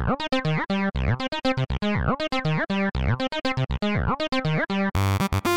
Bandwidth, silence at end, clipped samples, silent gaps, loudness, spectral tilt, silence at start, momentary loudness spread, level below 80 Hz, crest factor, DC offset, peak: 17.5 kHz; 0 s; under 0.1%; none; -25 LUFS; -6 dB/octave; 0 s; 2 LU; -36 dBFS; 14 dB; 0.8%; -10 dBFS